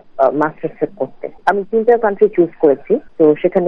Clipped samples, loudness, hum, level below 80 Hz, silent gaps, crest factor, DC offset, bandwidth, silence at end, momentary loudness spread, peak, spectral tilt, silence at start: under 0.1%; -15 LUFS; none; -54 dBFS; none; 14 dB; under 0.1%; 6 kHz; 0 s; 9 LU; 0 dBFS; -9 dB/octave; 0.15 s